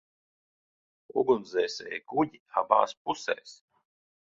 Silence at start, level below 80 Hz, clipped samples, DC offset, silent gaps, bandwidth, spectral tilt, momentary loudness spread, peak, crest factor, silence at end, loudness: 1.15 s; -72 dBFS; under 0.1%; under 0.1%; 2.40-2.46 s, 2.97-3.05 s; 7.8 kHz; -4.5 dB/octave; 9 LU; -6 dBFS; 26 dB; 0.7 s; -29 LUFS